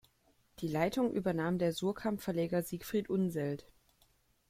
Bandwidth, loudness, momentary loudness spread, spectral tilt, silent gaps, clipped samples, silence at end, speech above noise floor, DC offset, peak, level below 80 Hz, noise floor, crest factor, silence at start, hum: 16 kHz; -35 LUFS; 6 LU; -6.5 dB/octave; none; under 0.1%; 0.9 s; 37 dB; under 0.1%; -16 dBFS; -64 dBFS; -71 dBFS; 20 dB; 0.6 s; none